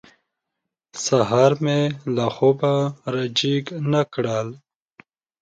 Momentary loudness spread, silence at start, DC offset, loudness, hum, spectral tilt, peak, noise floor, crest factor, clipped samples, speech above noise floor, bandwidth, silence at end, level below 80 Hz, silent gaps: 9 LU; 0.95 s; under 0.1%; -21 LUFS; none; -5.5 dB/octave; -4 dBFS; -82 dBFS; 18 dB; under 0.1%; 62 dB; 9.2 kHz; 0.85 s; -62 dBFS; none